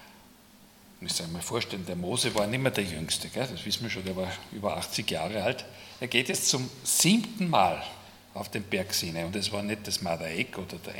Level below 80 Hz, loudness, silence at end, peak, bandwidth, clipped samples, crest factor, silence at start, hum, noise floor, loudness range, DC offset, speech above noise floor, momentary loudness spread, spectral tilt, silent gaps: -62 dBFS; -29 LUFS; 0 s; -6 dBFS; 18 kHz; under 0.1%; 26 dB; 0 s; none; -56 dBFS; 5 LU; under 0.1%; 26 dB; 12 LU; -3 dB/octave; none